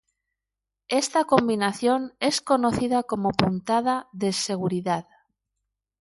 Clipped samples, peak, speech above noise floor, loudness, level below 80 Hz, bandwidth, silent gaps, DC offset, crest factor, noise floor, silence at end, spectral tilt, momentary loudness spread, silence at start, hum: under 0.1%; 0 dBFS; 63 dB; -24 LUFS; -56 dBFS; 11.5 kHz; none; under 0.1%; 24 dB; -87 dBFS; 1 s; -4.5 dB/octave; 6 LU; 0.9 s; 50 Hz at -50 dBFS